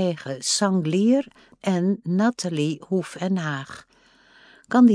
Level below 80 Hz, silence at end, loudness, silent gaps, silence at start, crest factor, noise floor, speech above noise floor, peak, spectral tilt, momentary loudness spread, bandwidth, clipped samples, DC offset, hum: -70 dBFS; 0 s; -23 LUFS; none; 0 s; 16 dB; -56 dBFS; 32 dB; -6 dBFS; -5 dB/octave; 11 LU; 10.5 kHz; under 0.1%; under 0.1%; none